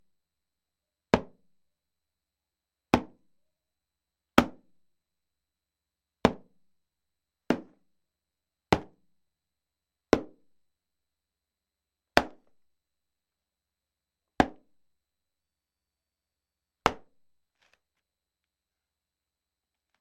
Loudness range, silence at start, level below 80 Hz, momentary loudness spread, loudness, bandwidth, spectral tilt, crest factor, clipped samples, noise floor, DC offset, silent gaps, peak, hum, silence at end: 6 LU; 1.15 s; -56 dBFS; 7 LU; -29 LUFS; 16 kHz; -5.5 dB/octave; 34 dB; under 0.1%; -89 dBFS; under 0.1%; none; -2 dBFS; none; 3.05 s